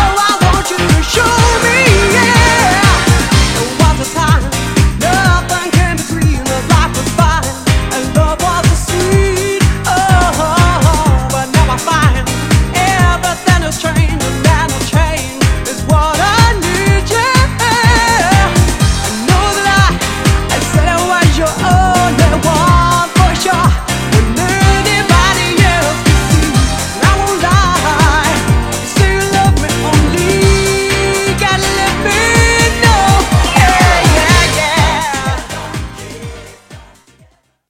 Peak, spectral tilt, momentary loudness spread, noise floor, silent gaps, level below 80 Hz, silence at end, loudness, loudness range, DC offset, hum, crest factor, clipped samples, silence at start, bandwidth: 0 dBFS; -4.5 dB/octave; 5 LU; -49 dBFS; none; -18 dBFS; 0.85 s; -11 LUFS; 3 LU; under 0.1%; none; 10 dB; 0.2%; 0 s; 16.5 kHz